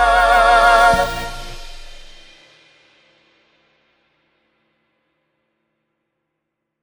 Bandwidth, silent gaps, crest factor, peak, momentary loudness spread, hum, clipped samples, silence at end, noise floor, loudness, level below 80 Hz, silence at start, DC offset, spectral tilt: over 20 kHz; none; 18 dB; -2 dBFS; 24 LU; none; under 0.1%; 4.85 s; -77 dBFS; -13 LUFS; -36 dBFS; 0 s; under 0.1%; -3 dB/octave